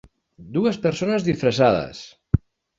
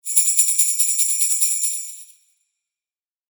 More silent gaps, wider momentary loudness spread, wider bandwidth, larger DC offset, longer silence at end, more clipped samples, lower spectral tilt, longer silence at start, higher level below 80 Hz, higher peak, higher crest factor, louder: neither; about the same, 10 LU vs 9 LU; second, 7.8 kHz vs over 20 kHz; neither; second, 0.4 s vs 1.25 s; neither; first, -6.5 dB/octave vs 12.5 dB/octave; first, 0.4 s vs 0.05 s; first, -40 dBFS vs under -90 dBFS; about the same, -2 dBFS vs 0 dBFS; about the same, 20 dB vs 20 dB; second, -22 LUFS vs -16 LUFS